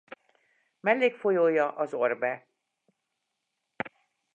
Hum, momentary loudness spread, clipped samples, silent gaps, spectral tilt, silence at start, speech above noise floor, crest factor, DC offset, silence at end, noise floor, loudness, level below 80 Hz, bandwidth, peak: none; 15 LU; under 0.1%; none; -6.5 dB/octave; 0.85 s; 56 dB; 22 dB; under 0.1%; 0.45 s; -82 dBFS; -27 LUFS; -84 dBFS; 7.6 kHz; -8 dBFS